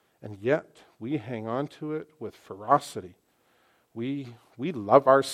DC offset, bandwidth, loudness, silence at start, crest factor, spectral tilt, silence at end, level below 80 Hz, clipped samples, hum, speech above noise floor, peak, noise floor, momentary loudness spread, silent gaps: under 0.1%; 14.5 kHz; -27 LUFS; 0.25 s; 24 dB; -6 dB/octave; 0 s; -76 dBFS; under 0.1%; none; 39 dB; -4 dBFS; -66 dBFS; 20 LU; none